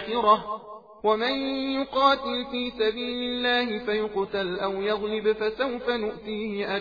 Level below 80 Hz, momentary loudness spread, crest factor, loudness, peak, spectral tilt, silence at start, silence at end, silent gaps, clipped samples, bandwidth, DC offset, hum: -56 dBFS; 9 LU; 20 dB; -26 LUFS; -8 dBFS; -6 dB/octave; 0 s; 0 s; none; under 0.1%; 5 kHz; under 0.1%; none